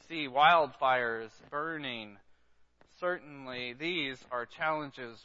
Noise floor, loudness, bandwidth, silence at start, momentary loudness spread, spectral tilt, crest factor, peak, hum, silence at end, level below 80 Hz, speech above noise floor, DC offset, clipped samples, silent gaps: -64 dBFS; -31 LUFS; 7.6 kHz; 0.1 s; 16 LU; -1 dB/octave; 22 dB; -10 dBFS; none; 0.05 s; -74 dBFS; 31 dB; under 0.1%; under 0.1%; none